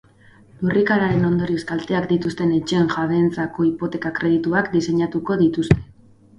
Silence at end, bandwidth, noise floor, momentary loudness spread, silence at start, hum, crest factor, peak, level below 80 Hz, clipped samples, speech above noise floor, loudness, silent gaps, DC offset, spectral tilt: 0.55 s; 10.5 kHz; -50 dBFS; 5 LU; 0.6 s; none; 20 dB; 0 dBFS; -44 dBFS; under 0.1%; 30 dB; -20 LUFS; none; under 0.1%; -7 dB/octave